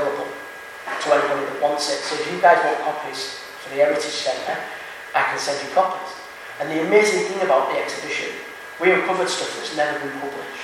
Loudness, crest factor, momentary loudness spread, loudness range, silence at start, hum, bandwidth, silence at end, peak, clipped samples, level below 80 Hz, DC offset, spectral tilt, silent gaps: -21 LUFS; 20 dB; 15 LU; 3 LU; 0 s; none; 16 kHz; 0 s; 0 dBFS; under 0.1%; -68 dBFS; under 0.1%; -3 dB/octave; none